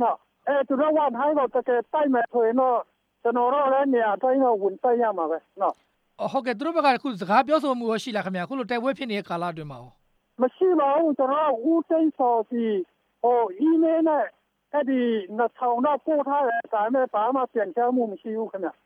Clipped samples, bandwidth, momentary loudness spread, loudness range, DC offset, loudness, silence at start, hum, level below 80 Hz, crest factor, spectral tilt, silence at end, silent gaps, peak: under 0.1%; 10.5 kHz; 8 LU; 2 LU; under 0.1%; -24 LUFS; 0 s; none; -74 dBFS; 16 dB; -6.5 dB/octave; 0.15 s; none; -8 dBFS